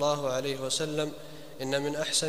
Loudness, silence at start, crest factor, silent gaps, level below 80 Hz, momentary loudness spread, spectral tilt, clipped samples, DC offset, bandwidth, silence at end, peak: -31 LUFS; 0 s; 18 dB; none; -62 dBFS; 12 LU; -3 dB/octave; under 0.1%; 0.5%; 15.5 kHz; 0 s; -12 dBFS